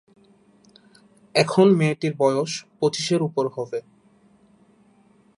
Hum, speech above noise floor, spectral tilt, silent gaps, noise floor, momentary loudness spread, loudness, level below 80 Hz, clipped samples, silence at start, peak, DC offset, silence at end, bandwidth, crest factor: none; 36 dB; -5.5 dB/octave; none; -57 dBFS; 13 LU; -22 LUFS; -70 dBFS; under 0.1%; 1.35 s; -4 dBFS; under 0.1%; 1.6 s; 11.5 kHz; 20 dB